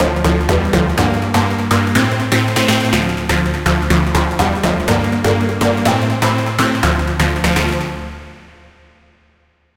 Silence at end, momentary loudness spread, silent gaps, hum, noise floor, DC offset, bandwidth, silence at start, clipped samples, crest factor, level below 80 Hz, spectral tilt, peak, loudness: 1.4 s; 3 LU; none; none; -57 dBFS; under 0.1%; 17 kHz; 0 s; under 0.1%; 14 dB; -24 dBFS; -5.5 dB/octave; -2 dBFS; -15 LUFS